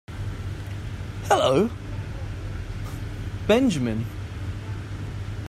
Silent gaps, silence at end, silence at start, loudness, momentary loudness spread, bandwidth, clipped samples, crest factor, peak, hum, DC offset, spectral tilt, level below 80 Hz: none; 0 s; 0.1 s; -27 LUFS; 14 LU; 14.5 kHz; under 0.1%; 20 dB; -6 dBFS; none; under 0.1%; -6 dB/octave; -40 dBFS